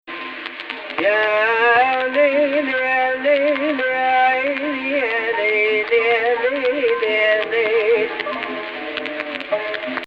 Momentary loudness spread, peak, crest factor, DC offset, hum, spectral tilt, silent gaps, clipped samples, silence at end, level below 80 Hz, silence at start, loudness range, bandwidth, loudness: 10 LU; -4 dBFS; 14 dB; under 0.1%; none; -5 dB/octave; none; under 0.1%; 0 s; -62 dBFS; 0.05 s; 3 LU; 6.2 kHz; -18 LUFS